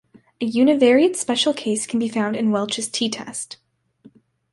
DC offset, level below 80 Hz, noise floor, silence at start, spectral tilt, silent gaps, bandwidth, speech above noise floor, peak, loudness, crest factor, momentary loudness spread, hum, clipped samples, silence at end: under 0.1%; -68 dBFS; -52 dBFS; 0.4 s; -3.5 dB/octave; none; 11.5 kHz; 33 dB; -4 dBFS; -20 LUFS; 16 dB; 13 LU; none; under 0.1%; 1 s